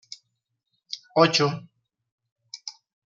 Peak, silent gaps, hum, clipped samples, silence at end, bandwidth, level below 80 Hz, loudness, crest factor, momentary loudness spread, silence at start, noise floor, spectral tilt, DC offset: -4 dBFS; 2.12-2.18 s, 2.32-2.36 s; none; under 0.1%; 0.35 s; 7.6 kHz; -74 dBFS; -22 LUFS; 24 dB; 24 LU; 0.9 s; -79 dBFS; -4.5 dB/octave; under 0.1%